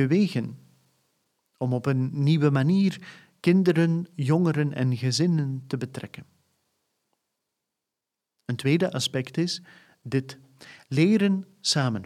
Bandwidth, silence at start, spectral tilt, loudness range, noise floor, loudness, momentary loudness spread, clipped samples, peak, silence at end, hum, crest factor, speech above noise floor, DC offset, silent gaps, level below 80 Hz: 13.5 kHz; 0 s; -6 dB/octave; 8 LU; -87 dBFS; -25 LUFS; 13 LU; under 0.1%; -8 dBFS; 0 s; none; 18 dB; 62 dB; under 0.1%; none; -72 dBFS